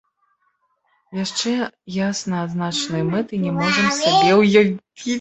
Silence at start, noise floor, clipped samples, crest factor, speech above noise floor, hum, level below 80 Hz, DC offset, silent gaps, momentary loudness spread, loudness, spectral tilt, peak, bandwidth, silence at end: 1.1 s; -67 dBFS; under 0.1%; 18 dB; 48 dB; none; -58 dBFS; under 0.1%; none; 12 LU; -19 LUFS; -4.5 dB/octave; -2 dBFS; 8.2 kHz; 0 s